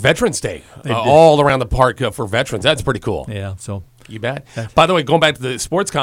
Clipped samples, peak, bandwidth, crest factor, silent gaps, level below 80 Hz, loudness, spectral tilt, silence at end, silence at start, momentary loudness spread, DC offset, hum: under 0.1%; 0 dBFS; 16.5 kHz; 16 dB; none; -36 dBFS; -15 LUFS; -4.5 dB/octave; 0 s; 0 s; 16 LU; under 0.1%; none